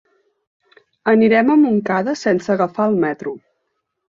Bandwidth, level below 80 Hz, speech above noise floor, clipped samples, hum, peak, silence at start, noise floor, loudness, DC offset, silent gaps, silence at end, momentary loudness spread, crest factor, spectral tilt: 7.6 kHz; -62 dBFS; 57 dB; under 0.1%; none; -2 dBFS; 1.05 s; -73 dBFS; -16 LUFS; under 0.1%; none; 0.8 s; 13 LU; 16 dB; -7 dB/octave